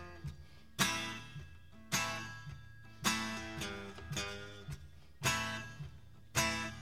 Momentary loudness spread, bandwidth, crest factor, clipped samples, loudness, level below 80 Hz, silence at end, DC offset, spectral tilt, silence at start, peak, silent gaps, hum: 18 LU; 16.5 kHz; 24 dB; under 0.1%; -38 LUFS; -58 dBFS; 0 s; 0.1%; -2.5 dB/octave; 0 s; -16 dBFS; none; none